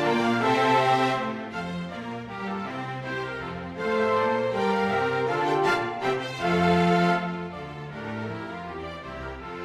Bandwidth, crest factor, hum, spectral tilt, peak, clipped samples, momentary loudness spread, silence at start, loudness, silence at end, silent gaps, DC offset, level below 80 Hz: 13 kHz; 16 dB; none; -6 dB/octave; -10 dBFS; under 0.1%; 15 LU; 0 s; -26 LUFS; 0 s; none; under 0.1%; -54 dBFS